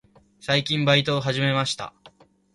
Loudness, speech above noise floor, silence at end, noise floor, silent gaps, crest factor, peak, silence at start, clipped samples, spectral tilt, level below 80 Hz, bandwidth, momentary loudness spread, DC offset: -22 LUFS; 31 dB; 0.45 s; -54 dBFS; none; 20 dB; -4 dBFS; 0.45 s; under 0.1%; -5 dB/octave; -58 dBFS; 11.5 kHz; 14 LU; under 0.1%